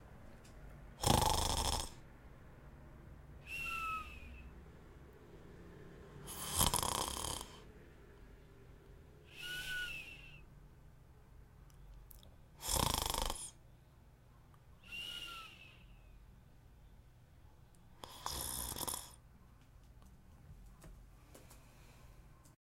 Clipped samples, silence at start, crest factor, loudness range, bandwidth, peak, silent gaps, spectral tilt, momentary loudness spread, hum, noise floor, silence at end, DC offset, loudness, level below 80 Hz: under 0.1%; 0 s; 30 dB; 12 LU; 16.5 kHz; -14 dBFS; none; -2.5 dB/octave; 27 LU; none; -63 dBFS; 0.1 s; under 0.1%; -39 LUFS; -52 dBFS